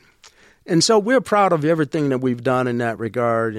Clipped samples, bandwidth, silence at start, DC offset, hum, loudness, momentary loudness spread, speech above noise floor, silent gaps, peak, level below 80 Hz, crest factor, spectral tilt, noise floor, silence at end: under 0.1%; 14.5 kHz; 0.25 s; under 0.1%; none; -19 LUFS; 7 LU; 32 dB; none; -6 dBFS; -60 dBFS; 14 dB; -5 dB/octave; -51 dBFS; 0 s